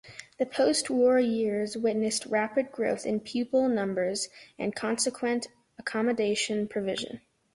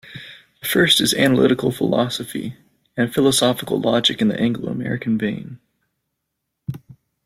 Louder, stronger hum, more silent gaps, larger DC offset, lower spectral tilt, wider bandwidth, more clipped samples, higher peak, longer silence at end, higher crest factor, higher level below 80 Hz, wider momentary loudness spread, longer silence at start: second, -28 LUFS vs -18 LUFS; neither; neither; neither; about the same, -3.5 dB/octave vs -4 dB/octave; second, 11.5 kHz vs 16.5 kHz; neither; second, -14 dBFS vs -2 dBFS; about the same, 0.35 s vs 0.35 s; about the same, 14 dB vs 18 dB; second, -68 dBFS vs -56 dBFS; second, 10 LU vs 19 LU; about the same, 0.05 s vs 0.05 s